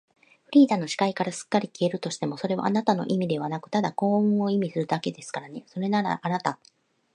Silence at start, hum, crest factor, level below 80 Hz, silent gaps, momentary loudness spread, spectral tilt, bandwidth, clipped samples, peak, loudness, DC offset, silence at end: 0.5 s; none; 18 dB; -74 dBFS; none; 10 LU; -6 dB/octave; 11 kHz; under 0.1%; -6 dBFS; -26 LUFS; under 0.1%; 0.6 s